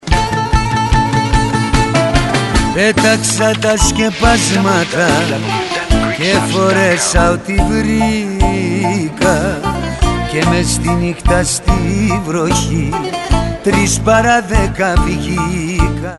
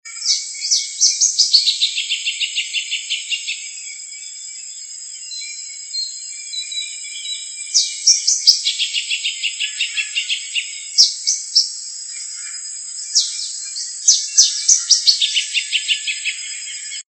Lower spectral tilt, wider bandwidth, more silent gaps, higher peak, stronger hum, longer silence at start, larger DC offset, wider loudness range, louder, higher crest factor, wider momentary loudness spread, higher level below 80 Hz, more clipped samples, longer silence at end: first, -4.5 dB/octave vs 11.5 dB/octave; about the same, 12 kHz vs 13 kHz; neither; about the same, 0 dBFS vs 0 dBFS; neither; about the same, 0.05 s vs 0.05 s; neither; second, 2 LU vs 11 LU; first, -13 LUFS vs -16 LUFS; second, 12 dB vs 20 dB; second, 5 LU vs 16 LU; first, -20 dBFS vs under -90 dBFS; neither; second, 0 s vs 0.15 s